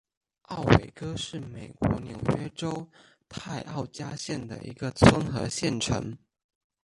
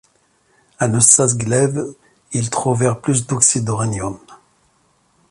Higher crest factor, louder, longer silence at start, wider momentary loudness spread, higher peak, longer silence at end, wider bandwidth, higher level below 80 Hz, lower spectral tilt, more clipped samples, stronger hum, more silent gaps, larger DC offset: first, 26 dB vs 18 dB; second, -28 LUFS vs -16 LUFS; second, 0.5 s vs 0.8 s; first, 19 LU vs 16 LU; about the same, -2 dBFS vs 0 dBFS; second, 0.65 s vs 0.95 s; about the same, 11.5 kHz vs 12 kHz; first, -44 dBFS vs -50 dBFS; about the same, -5.5 dB/octave vs -4.5 dB/octave; neither; neither; neither; neither